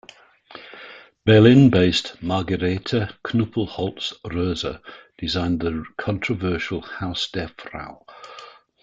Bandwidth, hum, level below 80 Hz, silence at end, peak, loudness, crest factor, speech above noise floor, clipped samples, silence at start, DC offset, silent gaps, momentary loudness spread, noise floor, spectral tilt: 7.8 kHz; none; -48 dBFS; 0.35 s; -2 dBFS; -21 LUFS; 20 dB; 28 dB; under 0.1%; 0.5 s; under 0.1%; none; 25 LU; -48 dBFS; -6.5 dB/octave